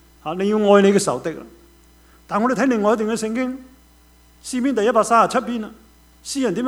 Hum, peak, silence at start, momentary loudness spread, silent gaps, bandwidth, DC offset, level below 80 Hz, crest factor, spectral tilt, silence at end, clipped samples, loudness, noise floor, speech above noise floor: 60 Hz at -55 dBFS; 0 dBFS; 0.25 s; 17 LU; none; 16 kHz; under 0.1%; -54 dBFS; 20 dB; -5 dB/octave; 0 s; under 0.1%; -19 LUFS; -51 dBFS; 33 dB